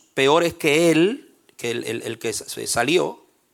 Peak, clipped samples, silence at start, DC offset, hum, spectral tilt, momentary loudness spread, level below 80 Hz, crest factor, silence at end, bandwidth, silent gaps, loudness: -4 dBFS; under 0.1%; 0.15 s; under 0.1%; none; -4 dB/octave; 11 LU; -60 dBFS; 18 dB; 0.4 s; 17.5 kHz; none; -21 LUFS